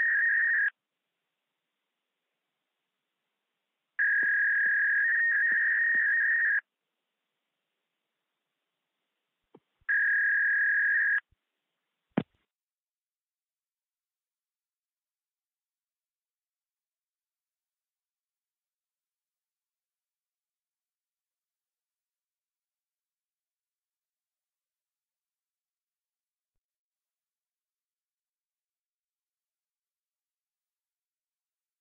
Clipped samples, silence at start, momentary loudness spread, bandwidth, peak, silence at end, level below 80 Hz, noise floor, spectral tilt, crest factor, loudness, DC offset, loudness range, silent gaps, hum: under 0.1%; 0 s; 9 LU; 3.8 kHz; -16 dBFS; 19.6 s; -88 dBFS; under -90 dBFS; -3 dB/octave; 20 dB; -25 LUFS; under 0.1%; 14 LU; none; none